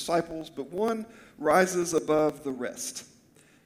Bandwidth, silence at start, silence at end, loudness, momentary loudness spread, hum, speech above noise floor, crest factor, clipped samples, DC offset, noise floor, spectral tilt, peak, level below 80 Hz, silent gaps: 17 kHz; 0 s; 0.6 s; -28 LUFS; 14 LU; none; 31 dB; 20 dB; under 0.1%; under 0.1%; -59 dBFS; -4 dB/octave; -10 dBFS; -64 dBFS; none